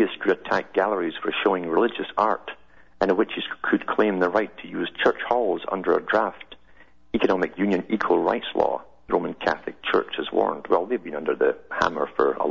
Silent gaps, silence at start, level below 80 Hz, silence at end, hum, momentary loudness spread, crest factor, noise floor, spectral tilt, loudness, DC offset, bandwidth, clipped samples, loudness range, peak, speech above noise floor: none; 0 s; -56 dBFS; 0 s; none; 7 LU; 22 dB; -55 dBFS; -6 dB/octave; -24 LUFS; 0.3%; 7.2 kHz; under 0.1%; 1 LU; -2 dBFS; 32 dB